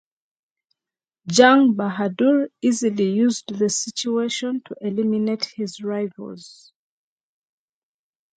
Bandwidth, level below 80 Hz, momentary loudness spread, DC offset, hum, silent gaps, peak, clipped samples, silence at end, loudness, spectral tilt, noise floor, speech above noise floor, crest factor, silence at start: 9.4 kHz; -68 dBFS; 14 LU; under 0.1%; none; none; 0 dBFS; under 0.1%; 1.85 s; -20 LUFS; -4 dB/octave; under -90 dBFS; over 70 dB; 22 dB; 1.25 s